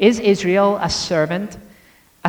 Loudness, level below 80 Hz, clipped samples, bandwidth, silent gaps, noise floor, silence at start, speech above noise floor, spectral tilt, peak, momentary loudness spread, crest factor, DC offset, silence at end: -18 LUFS; -46 dBFS; under 0.1%; 19.5 kHz; none; -51 dBFS; 0 s; 35 dB; -5 dB/octave; 0 dBFS; 9 LU; 18 dB; under 0.1%; 0 s